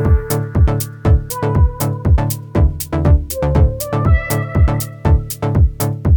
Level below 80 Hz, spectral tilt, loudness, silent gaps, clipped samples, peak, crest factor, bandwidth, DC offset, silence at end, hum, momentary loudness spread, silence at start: -18 dBFS; -7 dB/octave; -16 LUFS; none; under 0.1%; -2 dBFS; 12 dB; 19.5 kHz; under 0.1%; 0 s; none; 4 LU; 0 s